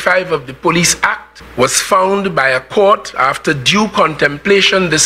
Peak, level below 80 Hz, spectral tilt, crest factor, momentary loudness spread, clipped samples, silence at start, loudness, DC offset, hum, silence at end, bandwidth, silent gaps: 0 dBFS; -44 dBFS; -3 dB/octave; 12 dB; 6 LU; under 0.1%; 0 s; -12 LUFS; 0.2%; none; 0 s; 16.5 kHz; none